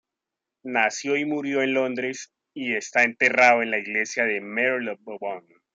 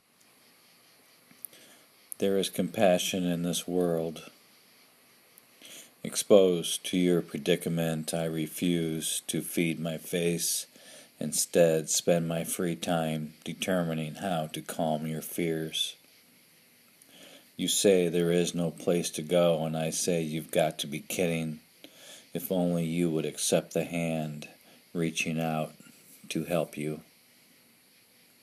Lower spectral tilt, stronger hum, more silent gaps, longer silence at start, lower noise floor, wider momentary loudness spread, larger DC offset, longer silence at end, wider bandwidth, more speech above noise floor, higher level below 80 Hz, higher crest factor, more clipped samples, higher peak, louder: second, -3 dB/octave vs -4.5 dB/octave; neither; neither; second, 0.65 s vs 1.55 s; first, -86 dBFS vs -62 dBFS; about the same, 16 LU vs 15 LU; neither; second, 0.35 s vs 1.4 s; second, 9.2 kHz vs 15.5 kHz; first, 63 dB vs 33 dB; second, -76 dBFS vs -68 dBFS; about the same, 20 dB vs 24 dB; neither; about the same, -4 dBFS vs -6 dBFS; first, -23 LUFS vs -29 LUFS